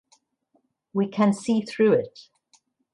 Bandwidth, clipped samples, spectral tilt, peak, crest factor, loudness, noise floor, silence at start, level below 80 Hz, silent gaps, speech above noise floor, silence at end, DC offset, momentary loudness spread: 11 kHz; under 0.1%; -6.5 dB/octave; -10 dBFS; 16 dB; -23 LUFS; -69 dBFS; 0.95 s; -72 dBFS; none; 47 dB; 0.85 s; under 0.1%; 9 LU